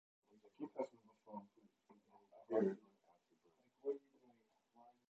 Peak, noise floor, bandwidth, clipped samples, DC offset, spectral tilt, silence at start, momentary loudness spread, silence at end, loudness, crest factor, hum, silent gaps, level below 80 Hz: -24 dBFS; -78 dBFS; 7.8 kHz; under 0.1%; under 0.1%; -8 dB/octave; 0.45 s; 17 LU; 0.2 s; -46 LUFS; 24 dB; none; none; under -90 dBFS